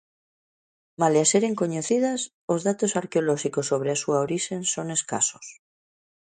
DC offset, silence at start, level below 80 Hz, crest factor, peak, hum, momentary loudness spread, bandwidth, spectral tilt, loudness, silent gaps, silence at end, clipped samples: under 0.1%; 1 s; -70 dBFS; 18 dB; -6 dBFS; none; 7 LU; 9.6 kHz; -4 dB/octave; -24 LUFS; 2.34-2.48 s; 0.75 s; under 0.1%